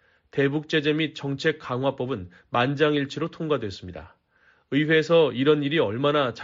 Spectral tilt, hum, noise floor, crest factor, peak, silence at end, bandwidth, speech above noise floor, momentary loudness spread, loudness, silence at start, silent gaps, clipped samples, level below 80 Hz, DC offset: -4 dB/octave; none; -62 dBFS; 16 dB; -8 dBFS; 0 s; 7.6 kHz; 38 dB; 11 LU; -24 LUFS; 0.35 s; none; under 0.1%; -60 dBFS; under 0.1%